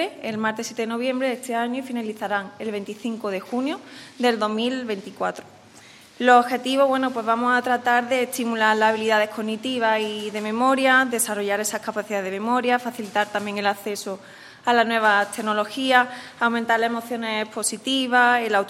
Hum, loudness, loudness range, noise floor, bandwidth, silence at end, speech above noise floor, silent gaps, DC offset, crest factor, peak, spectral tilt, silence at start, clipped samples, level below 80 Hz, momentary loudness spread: none; -22 LUFS; 6 LU; -48 dBFS; 16 kHz; 0 s; 25 dB; none; under 0.1%; 22 dB; -2 dBFS; -3 dB/octave; 0 s; under 0.1%; -74 dBFS; 11 LU